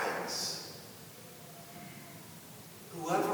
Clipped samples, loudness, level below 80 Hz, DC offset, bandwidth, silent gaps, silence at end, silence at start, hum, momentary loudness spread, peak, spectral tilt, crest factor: under 0.1%; -40 LUFS; -78 dBFS; under 0.1%; over 20 kHz; none; 0 s; 0 s; none; 15 LU; -18 dBFS; -3 dB/octave; 22 dB